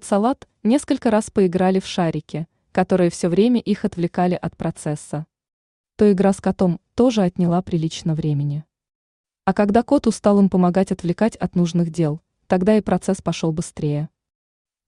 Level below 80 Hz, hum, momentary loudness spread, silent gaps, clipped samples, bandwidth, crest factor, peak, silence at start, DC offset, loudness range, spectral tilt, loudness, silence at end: -50 dBFS; none; 10 LU; 5.53-5.84 s, 8.95-9.24 s; under 0.1%; 11 kHz; 16 dB; -4 dBFS; 0.05 s; under 0.1%; 3 LU; -7 dB/octave; -20 LUFS; 0.8 s